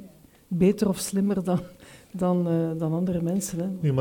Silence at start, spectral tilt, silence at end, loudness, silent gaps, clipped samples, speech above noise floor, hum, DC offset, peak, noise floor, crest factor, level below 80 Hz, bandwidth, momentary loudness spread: 0 s; -7 dB/octave; 0 s; -26 LUFS; none; under 0.1%; 25 dB; none; under 0.1%; -10 dBFS; -50 dBFS; 16 dB; -54 dBFS; 18.5 kHz; 7 LU